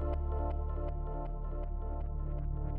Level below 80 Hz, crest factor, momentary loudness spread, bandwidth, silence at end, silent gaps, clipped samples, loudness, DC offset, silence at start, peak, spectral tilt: -36 dBFS; 10 dB; 5 LU; 3.2 kHz; 0 s; none; under 0.1%; -39 LUFS; under 0.1%; 0 s; -24 dBFS; -10 dB/octave